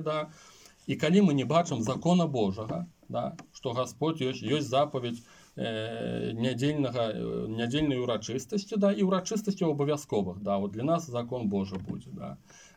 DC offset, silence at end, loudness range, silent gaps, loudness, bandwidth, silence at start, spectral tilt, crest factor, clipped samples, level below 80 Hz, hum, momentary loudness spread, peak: under 0.1%; 0.15 s; 4 LU; none; -30 LUFS; 15.5 kHz; 0 s; -6 dB/octave; 18 dB; under 0.1%; -60 dBFS; none; 12 LU; -12 dBFS